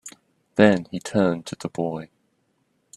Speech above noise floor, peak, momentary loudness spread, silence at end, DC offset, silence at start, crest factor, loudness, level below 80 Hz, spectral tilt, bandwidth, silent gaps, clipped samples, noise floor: 47 dB; 0 dBFS; 15 LU; 0.9 s; under 0.1%; 0.05 s; 24 dB; -23 LUFS; -60 dBFS; -6 dB/octave; 12 kHz; none; under 0.1%; -69 dBFS